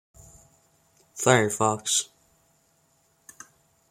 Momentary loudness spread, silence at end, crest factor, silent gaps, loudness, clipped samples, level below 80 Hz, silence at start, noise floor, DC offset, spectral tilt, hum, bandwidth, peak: 25 LU; 1.85 s; 26 dB; none; -23 LUFS; under 0.1%; -64 dBFS; 1.15 s; -66 dBFS; under 0.1%; -3 dB/octave; none; 16.5 kHz; -4 dBFS